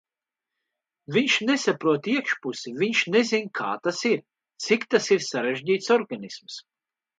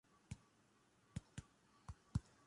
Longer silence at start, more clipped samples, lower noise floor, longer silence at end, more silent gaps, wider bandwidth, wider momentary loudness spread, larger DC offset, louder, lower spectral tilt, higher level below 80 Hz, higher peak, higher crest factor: first, 1.1 s vs 0.3 s; neither; first, -89 dBFS vs -75 dBFS; first, 0.6 s vs 0.25 s; neither; second, 9.4 kHz vs 11.5 kHz; about the same, 13 LU vs 12 LU; neither; first, -24 LUFS vs -54 LUFS; second, -3.5 dB/octave vs -6 dB/octave; second, -76 dBFS vs -62 dBFS; first, -6 dBFS vs -28 dBFS; second, 18 dB vs 26 dB